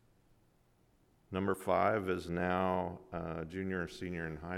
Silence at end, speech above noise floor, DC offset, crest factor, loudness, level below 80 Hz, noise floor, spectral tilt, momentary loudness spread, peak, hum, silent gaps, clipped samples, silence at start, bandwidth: 0 s; 34 dB; under 0.1%; 20 dB; -36 LUFS; -62 dBFS; -70 dBFS; -7 dB/octave; 10 LU; -18 dBFS; none; none; under 0.1%; 1.3 s; 15.5 kHz